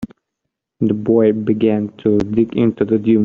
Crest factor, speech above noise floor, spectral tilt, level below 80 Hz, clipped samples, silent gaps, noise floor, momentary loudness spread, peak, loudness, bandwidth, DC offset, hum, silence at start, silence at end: 14 dB; 63 dB; -8.5 dB/octave; -48 dBFS; under 0.1%; none; -78 dBFS; 5 LU; -2 dBFS; -16 LUFS; 6.4 kHz; under 0.1%; none; 0 s; 0 s